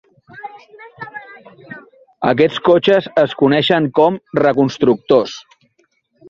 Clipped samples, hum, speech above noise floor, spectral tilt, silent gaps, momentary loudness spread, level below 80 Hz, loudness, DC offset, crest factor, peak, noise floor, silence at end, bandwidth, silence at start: under 0.1%; none; 47 dB; -6.5 dB/octave; none; 22 LU; -56 dBFS; -14 LUFS; under 0.1%; 16 dB; -2 dBFS; -61 dBFS; 0.9 s; 7.6 kHz; 0.35 s